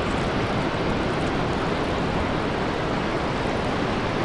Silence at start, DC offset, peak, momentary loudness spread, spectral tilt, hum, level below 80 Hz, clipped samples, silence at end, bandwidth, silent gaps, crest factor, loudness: 0 s; under 0.1%; -12 dBFS; 1 LU; -6 dB/octave; none; -36 dBFS; under 0.1%; 0 s; 11.5 kHz; none; 12 dB; -25 LUFS